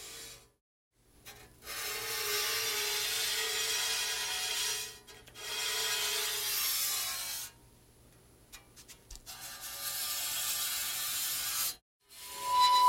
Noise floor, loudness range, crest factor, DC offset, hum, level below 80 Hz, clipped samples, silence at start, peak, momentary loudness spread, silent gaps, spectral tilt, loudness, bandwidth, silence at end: -61 dBFS; 6 LU; 20 dB; under 0.1%; 60 Hz at -70 dBFS; -64 dBFS; under 0.1%; 0 s; -14 dBFS; 19 LU; 0.61-0.91 s, 11.82-12.00 s; 1.5 dB/octave; -32 LUFS; 17 kHz; 0 s